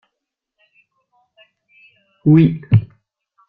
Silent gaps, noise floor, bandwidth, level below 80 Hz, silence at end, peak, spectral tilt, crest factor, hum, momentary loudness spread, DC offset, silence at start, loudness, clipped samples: none; -80 dBFS; 4.1 kHz; -50 dBFS; 0.65 s; -2 dBFS; -12 dB/octave; 18 dB; none; 11 LU; under 0.1%; 2.25 s; -15 LUFS; under 0.1%